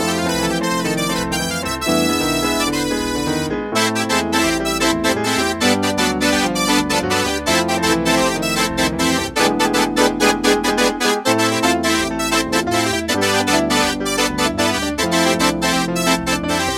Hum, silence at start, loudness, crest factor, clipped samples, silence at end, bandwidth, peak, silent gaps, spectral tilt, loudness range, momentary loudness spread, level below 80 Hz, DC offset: none; 0 s; -17 LUFS; 16 dB; under 0.1%; 0 s; 18 kHz; 0 dBFS; none; -3 dB/octave; 2 LU; 3 LU; -38 dBFS; under 0.1%